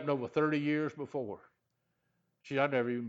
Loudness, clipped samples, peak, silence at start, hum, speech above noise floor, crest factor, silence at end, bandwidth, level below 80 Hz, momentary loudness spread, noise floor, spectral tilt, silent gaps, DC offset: -33 LUFS; under 0.1%; -14 dBFS; 0 s; none; 48 dB; 20 dB; 0 s; 7.8 kHz; -80 dBFS; 10 LU; -81 dBFS; -7.5 dB/octave; none; under 0.1%